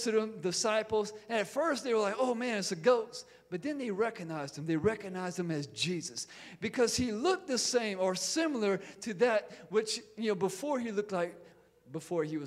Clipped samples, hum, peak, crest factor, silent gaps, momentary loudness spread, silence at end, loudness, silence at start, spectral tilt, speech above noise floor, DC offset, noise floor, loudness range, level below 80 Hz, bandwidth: under 0.1%; none; -14 dBFS; 20 dB; none; 10 LU; 0 s; -33 LUFS; 0 s; -3.5 dB/octave; 25 dB; under 0.1%; -58 dBFS; 4 LU; -68 dBFS; 15 kHz